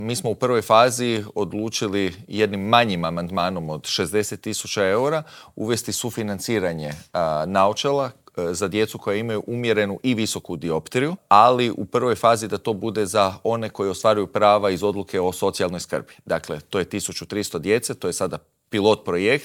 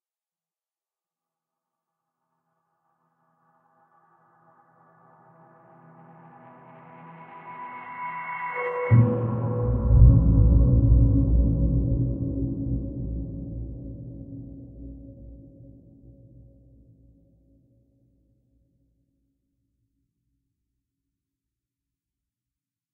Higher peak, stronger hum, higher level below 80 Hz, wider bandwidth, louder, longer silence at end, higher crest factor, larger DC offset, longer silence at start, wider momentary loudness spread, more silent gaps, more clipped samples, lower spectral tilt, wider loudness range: first, 0 dBFS vs -4 dBFS; neither; second, -58 dBFS vs -30 dBFS; first, 19.5 kHz vs 2.9 kHz; about the same, -22 LUFS vs -23 LUFS; second, 0 s vs 7.55 s; about the same, 22 dB vs 24 dB; neither; second, 0 s vs 7.05 s; second, 10 LU vs 24 LU; neither; neither; second, -4.5 dB/octave vs -11 dB/octave; second, 4 LU vs 23 LU